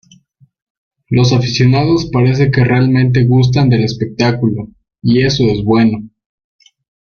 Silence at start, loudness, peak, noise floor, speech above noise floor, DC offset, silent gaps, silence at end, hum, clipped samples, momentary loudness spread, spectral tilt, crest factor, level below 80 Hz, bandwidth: 1.1 s; -12 LUFS; 0 dBFS; -49 dBFS; 38 dB; under 0.1%; none; 1 s; none; under 0.1%; 7 LU; -7 dB/octave; 12 dB; -40 dBFS; 6.8 kHz